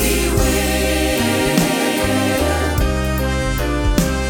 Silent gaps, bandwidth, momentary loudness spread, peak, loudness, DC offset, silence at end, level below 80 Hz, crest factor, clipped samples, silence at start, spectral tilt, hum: none; 19 kHz; 4 LU; 0 dBFS; -17 LUFS; under 0.1%; 0 s; -22 dBFS; 16 dB; under 0.1%; 0 s; -4.5 dB/octave; none